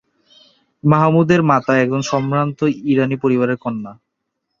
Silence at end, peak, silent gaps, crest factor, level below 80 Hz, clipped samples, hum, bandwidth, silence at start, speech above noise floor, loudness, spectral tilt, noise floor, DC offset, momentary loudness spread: 0.65 s; 0 dBFS; none; 16 dB; -56 dBFS; under 0.1%; none; 7.4 kHz; 0.85 s; 59 dB; -16 LUFS; -7 dB/octave; -75 dBFS; under 0.1%; 9 LU